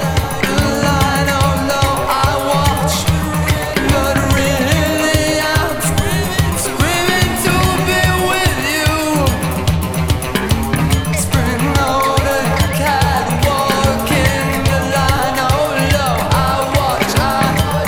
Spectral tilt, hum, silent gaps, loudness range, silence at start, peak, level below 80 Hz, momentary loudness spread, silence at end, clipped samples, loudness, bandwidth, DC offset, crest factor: -4.5 dB/octave; none; none; 1 LU; 0 s; 0 dBFS; -24 dBFS; 3 LU; 0 s; under 0.1%; -14 LUFS; 20 kHz; under 0.1%; 14 dB